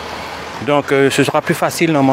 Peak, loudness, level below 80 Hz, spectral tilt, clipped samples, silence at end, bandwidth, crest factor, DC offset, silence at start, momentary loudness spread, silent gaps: 0 dBFS; -15 LUFS; -50 dBFS; -5 dB/octave; under 0.1%; 0 s; 16 kHz; 14 dB; under 0.1%; 0 s; 13 LU; none